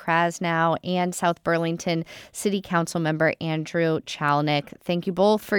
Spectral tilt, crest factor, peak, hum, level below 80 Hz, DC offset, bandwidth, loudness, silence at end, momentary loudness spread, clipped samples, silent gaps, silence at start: -5.5 dB/octave; 16 dB; -8 dBFS; none; -62 dBFS; under 0.1%; 18.5 kHz; -24 LUFS; 0 s; 6 LU; under 0.1%; none; 0 s